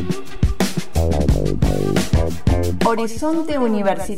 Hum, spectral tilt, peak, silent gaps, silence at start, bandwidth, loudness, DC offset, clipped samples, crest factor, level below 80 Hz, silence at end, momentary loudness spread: none; -6.5 dB/octave; -4 dBFS; none; 0 s; 16 kHz; -20 LUFS; 7%; under 0.1%; 14 dB; -26 dBFS; 0 s; 3 LU